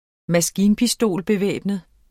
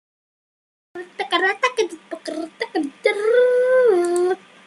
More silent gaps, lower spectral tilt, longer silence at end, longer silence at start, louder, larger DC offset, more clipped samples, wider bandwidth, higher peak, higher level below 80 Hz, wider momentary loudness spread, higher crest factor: neither; first, -4.5 dB/octave vs -2.5 dB/octave; about the same, 0.3 s vs 0.3 s; second, 0.3 s vs 0.95 s; about the same, -20 LUFS vs -19 LUFS; neither; neither; first, 16.5 kHz vs 12 kHz; about the same, -6 dBFS vs -4 dBFS; first, -52 dBFS vs -76 dBFS; second, 8 LU vs 16 LU; about the same, 14 dB vs 18 dB